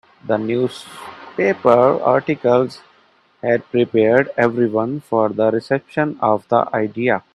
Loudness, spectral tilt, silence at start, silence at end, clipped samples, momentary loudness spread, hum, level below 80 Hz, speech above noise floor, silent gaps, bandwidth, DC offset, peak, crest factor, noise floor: -18 LUFS; -7.5 dB/octave; 0.25 s; 0.15 s; under 0.1%; 9 LU; none; -62 dBFS; 38 dB; none; 12 kHz; under 0.1%; 0 dBFS; 18 dB; -55 dBFS